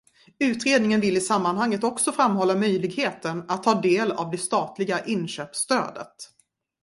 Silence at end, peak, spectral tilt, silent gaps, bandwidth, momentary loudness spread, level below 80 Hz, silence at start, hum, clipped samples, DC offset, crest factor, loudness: 0.6 s; -4 dBFS; -4 dB/octave; none; 11.5 kHz; 10 LU; -66 dBFS; 0.4 s; none; under 0.1%; under 0.1%; 20 dB; -24 LUFS